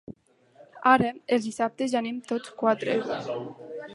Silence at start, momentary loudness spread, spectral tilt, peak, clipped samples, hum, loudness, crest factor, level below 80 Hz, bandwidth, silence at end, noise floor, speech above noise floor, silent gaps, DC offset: 0.1 s; 13 LU; -5 dB/octave; -6 dBFS; under 0.1%; none; -26 LUFS; 22 dB; -66 dBFS; 11.5 kHz; 0 s; -58 dBFS; 32 dB; none; under 0.1%